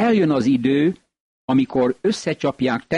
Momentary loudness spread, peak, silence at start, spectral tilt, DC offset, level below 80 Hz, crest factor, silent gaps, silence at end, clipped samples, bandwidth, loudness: 6 LU; -8 dBFS; 0 s; -6.5 dB/octave; under 0.1%; -56 dBFS; 12 dB; 1.20-1.48 s; 0 s; under 0.1%; 10.5 kHz; -20 LUFS